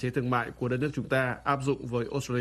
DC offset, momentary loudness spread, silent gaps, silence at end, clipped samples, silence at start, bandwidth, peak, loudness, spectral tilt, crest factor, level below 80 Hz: under 0.1%; 3 LU; none; 0 s; under 0.1%; 0 s; 13.5 kHz; -12 dBFS; -30 LUFS; -6.5 dB/octave; 18 dB; -56 dBFS